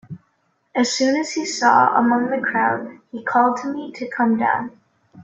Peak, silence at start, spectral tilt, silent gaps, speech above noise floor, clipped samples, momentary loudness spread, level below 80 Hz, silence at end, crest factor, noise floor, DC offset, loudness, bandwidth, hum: -2 dBFS; 0.1 s; -3.5 dB/octave; none; 47 dB; under 0.1%; 14 LU; -68 dBFS; 0 s; 18 dB; -66 dBFS; under 0.1%; -19 LUFS; 8.4 kHz; none